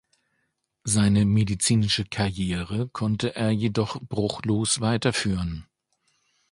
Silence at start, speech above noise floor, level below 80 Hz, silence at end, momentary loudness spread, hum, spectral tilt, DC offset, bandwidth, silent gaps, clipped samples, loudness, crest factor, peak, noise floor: 0.85 s; 51 dB; -46 dBFS; 0.9 s; 8 LU; none; -5 dB/octave; under 0.1%; 11.5 kHz; none; under 0.1%; -24 LUFS; 18 dB; -8 dBFS; -75 dBFS